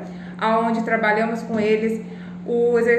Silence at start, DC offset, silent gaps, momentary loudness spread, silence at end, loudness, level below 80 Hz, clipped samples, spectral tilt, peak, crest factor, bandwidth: 0 s; under 0.1%; none; 13 LU; 0 s; -21 LUFS; -60 dBFS; under 0.1%; -6.5 dB/octave; -6 dBFS; 14 dB; 9 kHz